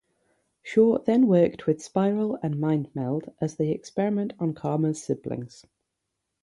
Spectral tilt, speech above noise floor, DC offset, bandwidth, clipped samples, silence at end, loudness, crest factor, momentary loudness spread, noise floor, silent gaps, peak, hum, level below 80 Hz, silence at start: -8 dB/octave; 57 dB; under 0.1%; 11.5 kHz; under 0.1%; 0.95 s; -25 LUFS; 18 dB; 10 LU; -82 dBFS; none; -8 dBFS; none; -64 dBFS; 0.65 s